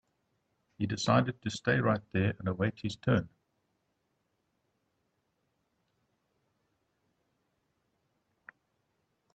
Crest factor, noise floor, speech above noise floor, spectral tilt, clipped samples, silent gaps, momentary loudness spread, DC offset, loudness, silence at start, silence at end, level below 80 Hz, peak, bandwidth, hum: 24 dB; -79 dBFS; 49 dB; -6 dB/octave; under 0.1%; none; 8 LU; under 0.1%; -31 LUFS; 0.8 s; 6.1 s; -66 dBFS; -12 dBFS; 8.8 kHz; none